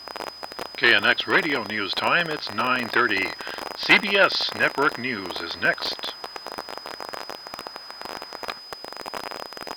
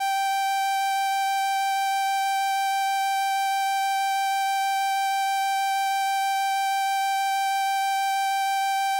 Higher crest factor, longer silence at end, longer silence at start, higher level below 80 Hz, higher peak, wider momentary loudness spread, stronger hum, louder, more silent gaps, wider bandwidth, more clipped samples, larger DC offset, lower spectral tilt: first, 24 dB vs 6 dB; about the same, 0 s vs 0 s; about the same, 0 s vs 0 s; first, -64 dBFS vs -78 dBFS; first, 0 dBFS vs -20 dBFS; first, 17 LU vs 0 LU; second, none vs 50 Hz at -75 dBFS; about the same, -22 LUFS vs -24 LUFS; neither; first, 19.5 kHz vs 17 kHz; neither; neither; first, -3 dB/octave vs 4.5 dB/octave